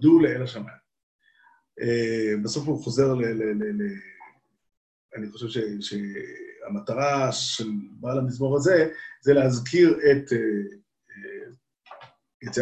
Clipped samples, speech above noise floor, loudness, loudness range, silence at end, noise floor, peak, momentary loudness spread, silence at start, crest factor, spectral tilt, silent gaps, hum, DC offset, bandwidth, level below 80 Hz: under 0.1%; 37 dB; -24 LUFS; 9 LU; 0 s; -61 dBFS; -6 dBFS; 20 LU; 0 s; 20 dB; -5.5 dB/octave; 1.03-1.19 s, 4.77-5.09 s, 12.34-12.40 s; none; under 0.1%; 9 kHz; -62 dBFS